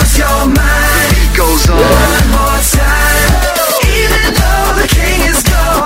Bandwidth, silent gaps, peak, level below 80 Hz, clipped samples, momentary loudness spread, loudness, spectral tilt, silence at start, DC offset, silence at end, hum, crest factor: 16.5 kHz; none; 0 dBFS; -12 dBFS; 0.1%; 2 LU; -9 LUFS; -3.5 dB/octave; 0 s; under 0.1%; 0 s; none; 8 dB